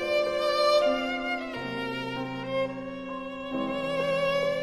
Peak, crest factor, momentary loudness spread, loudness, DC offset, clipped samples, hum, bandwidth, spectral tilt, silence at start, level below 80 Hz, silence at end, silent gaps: -12 dBFS; 16 dB; 13 LU; -28 LUFS; under 0.1%; under 0.1%; none; 14.5 kHz; -4.5 dB/octave; 0 s; -56 dBFS; 0 s; none